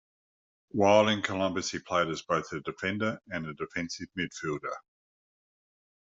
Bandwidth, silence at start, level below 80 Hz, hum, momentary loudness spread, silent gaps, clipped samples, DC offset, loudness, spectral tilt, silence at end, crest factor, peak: 8 kHz; 0.75 s; -68 dBFS; none; 14 LU; none; under 0.1%; under 0.1%; -30 LUFS; -4.5 dB/octave; 1.3 s; 22 dB; -8 dBFS